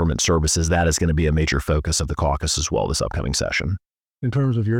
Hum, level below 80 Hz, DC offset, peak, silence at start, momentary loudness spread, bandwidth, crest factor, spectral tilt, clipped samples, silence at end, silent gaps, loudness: none; -30 dBFS; 0.1%; -8 dBFS; 0 s; 5 LU; 16.5 kHz; 14 dB; -4.5 dB/octave; under 0.1%; 0 s; none; -21 LUFS